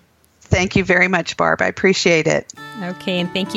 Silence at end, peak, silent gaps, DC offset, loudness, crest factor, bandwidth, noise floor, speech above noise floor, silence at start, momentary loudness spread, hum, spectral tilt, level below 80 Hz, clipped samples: 0 s; -2 dBFS; none; under 0.1%; -17 LUFS; 16 dB; 12 kHz; -52 dBFS; 35 dB; 0.5 s; 12 LU; none; -4.5 dB/octave; -40 dBFS; under 0.1%